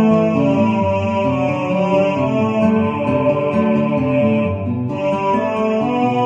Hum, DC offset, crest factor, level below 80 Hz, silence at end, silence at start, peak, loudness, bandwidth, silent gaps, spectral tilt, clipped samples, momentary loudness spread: none; under 0.1%; 12 dB; -52 dBFS; 0 s; 0 s; -4 dBFS; -17 LUFS; 7.6 kHz; none; -8.5 dB/octave; under 0.1%; 3 LU